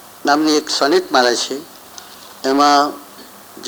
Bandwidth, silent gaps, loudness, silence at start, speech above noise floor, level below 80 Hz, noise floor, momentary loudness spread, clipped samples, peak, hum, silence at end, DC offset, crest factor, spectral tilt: over 20 kHz; none; -15 LUFS; 0.25 s; 24 dB; -68 dBFS; -39 dBFS; 23 LU; under 0.1%; 0 dBFS; none; 0 s; under 0.1%; 18 dB; -2 dB/octave